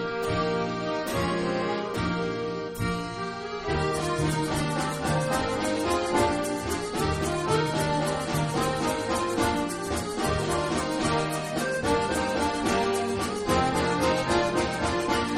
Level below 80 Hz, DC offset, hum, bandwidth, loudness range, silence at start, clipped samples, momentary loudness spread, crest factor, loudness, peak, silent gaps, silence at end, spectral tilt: -44 dBFS; under 0.1%; none; 14.5 kHz; 3 LU; 0 s; under 0.1%; 5 LU; 16 dB; -27 LUFS; -10 dBFS; none; 0 s; -4.5 dB/octave